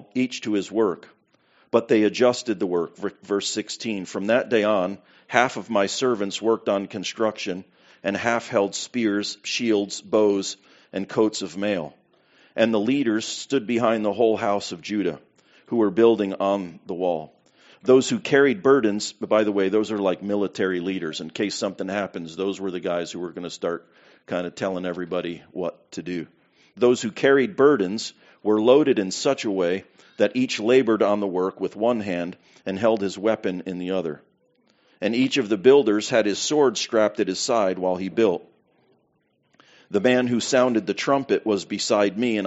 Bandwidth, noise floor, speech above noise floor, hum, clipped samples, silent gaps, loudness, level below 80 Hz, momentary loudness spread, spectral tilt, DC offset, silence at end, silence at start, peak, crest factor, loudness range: 8 kHz; -68 dBFS; 45 dB; none; under 0.1%; none; -23 LUFS; -70 dBFS; 12 LU; -4 dB/octave; under 0.1%; 0 s; 0 s; 0 dBFS; 22 dB; 6 LU